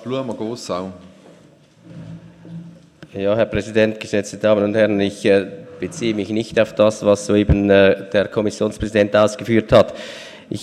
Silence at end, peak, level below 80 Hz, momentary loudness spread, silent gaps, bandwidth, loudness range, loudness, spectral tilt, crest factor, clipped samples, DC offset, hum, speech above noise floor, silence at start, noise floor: 0 s; 0 dBFS; -38 dBFS; 21 LU; none; 12 kHz; 9 LU; -18 LUFS; -6 dB/octave; 18 dB; under 0.1%; under 0.1%; none; 32 dB; 0 s; -49 dBFS